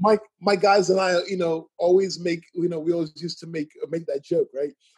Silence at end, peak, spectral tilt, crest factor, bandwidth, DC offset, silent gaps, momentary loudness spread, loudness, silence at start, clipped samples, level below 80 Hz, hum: 0.25 s; -6 dBFS; -5.5 dB/octave; 18 dB; 10.5 kHz; under 0.1%; none; 13 LU; -24 LUFS; 0 s; under 0.1%; -72 dBFS; none